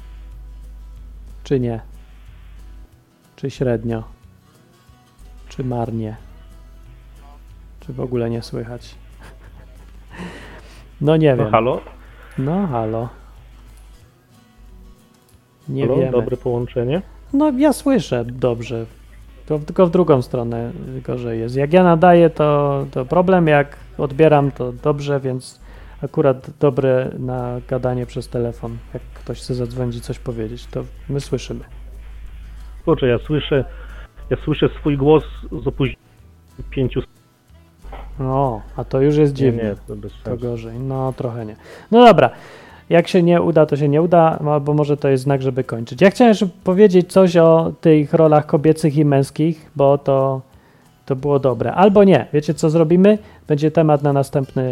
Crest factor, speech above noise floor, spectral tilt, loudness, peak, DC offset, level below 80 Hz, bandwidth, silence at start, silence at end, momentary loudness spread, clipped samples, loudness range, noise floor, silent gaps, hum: 18 dB; 35 dB; -7.5 dB/octave; -17 LUFS; 0 dBFS; under 0.1%; -40 dBFS; 13.5 kHz; 0 s; 0 s; 18 LU; under 0.1%; 14 LU; -51 dBFS; none; none